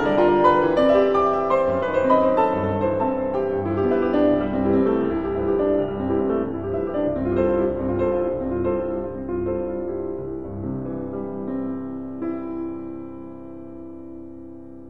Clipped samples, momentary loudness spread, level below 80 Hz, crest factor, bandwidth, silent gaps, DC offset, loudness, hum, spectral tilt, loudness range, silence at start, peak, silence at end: under 0.1%; 18 LU; -44 dBFS; 18 dB; 7.4 kHz; none; 0.7%; -22 LUFS; none; -9 dB/octave; 10 LU; 0 s; -4 dBFS; 0 s